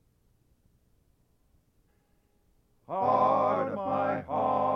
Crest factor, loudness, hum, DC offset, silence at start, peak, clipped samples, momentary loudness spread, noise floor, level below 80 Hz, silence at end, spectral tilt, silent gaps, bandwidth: 18 dB; -28 LUFS; none; under 0.1%; 2.9 s; -14 dBFS; under 0.1%; 6 LU; -69 dBFS; -68 dBFS; 0 s; -8.5 dB/octave; none; 6.4 kHz